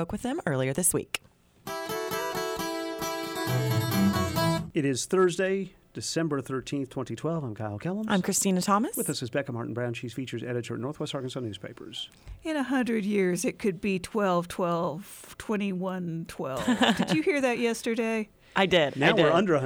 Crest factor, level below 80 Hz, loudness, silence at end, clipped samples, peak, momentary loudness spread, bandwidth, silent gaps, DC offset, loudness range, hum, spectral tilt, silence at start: 18 dB; -58 dBFS; -28 LUFS; 0 s; under 0.1%; -10 dBFS; 11 LU; over 20 kHz; none; under 0.1%; 4 LU; none; -4.5 dB/octave; 0 s